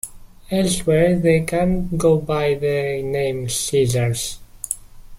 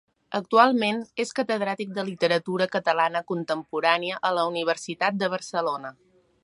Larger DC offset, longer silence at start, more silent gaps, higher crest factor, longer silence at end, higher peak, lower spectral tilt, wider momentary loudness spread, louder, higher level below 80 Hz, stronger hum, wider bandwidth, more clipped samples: neither; second, 0.05 s vs 0.3 s; neither; about the same, 18 dB vs 22 dB; second, 0 s vs 0.55 s; about the same, -2 dBFS vs -4 dBFS; about the same, -5 dB/octave vs -4.5 dB/octave; about the same, 11 LU vs 10 LU; first, -20 LUFS vs -25 LUFS; first, -38 dBFS vs -76 dBFS; neither; first, 16.5 kHz vs 11.5 kHz; neither